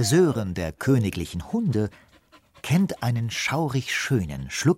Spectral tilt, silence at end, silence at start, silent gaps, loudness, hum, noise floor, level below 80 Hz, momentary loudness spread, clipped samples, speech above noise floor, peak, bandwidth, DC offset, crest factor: -5.5 dB/octave; 0 s; 0 s; none; -25 LUFS; none; -56 dBFS; -48 dBFS; 8 LU; under 0.1%; 33 dB; -8 dBFS; 16 kHz; under 0.1%; 16 dB